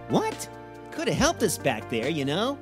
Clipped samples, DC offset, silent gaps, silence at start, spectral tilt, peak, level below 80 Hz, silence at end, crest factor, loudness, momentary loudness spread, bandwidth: under 0.1%; under 0.1%; none; 0 s; -4 dB/octave; -8 dBFS; -50 dBFS; 0 s; 18 dB; -26 LUFS; 15 LU; 16 kHz